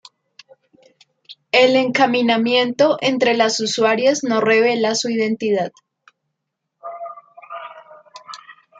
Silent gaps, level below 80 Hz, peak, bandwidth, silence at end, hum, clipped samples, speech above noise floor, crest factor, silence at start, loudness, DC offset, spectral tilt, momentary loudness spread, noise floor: none; -72 dBFS; -2 dBFS; 9.2 kHz; 0.3 s; none; under 0.1%; 61 dB; 18 dB; 1.3 s; -17 LUFS; under 0.1%; -3.5 dB/octave; 21 LU; -77 dBFS